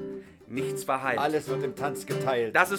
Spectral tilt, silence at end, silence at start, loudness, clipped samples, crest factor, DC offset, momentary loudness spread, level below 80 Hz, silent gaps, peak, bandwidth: -4.5 dB/octave; 0 s; 0 s; -29 LUFS; under 0.1%; 24 dB; under 0.1%; 11 LU; -66 dBFS; none; -4 dBFS; 19 kHz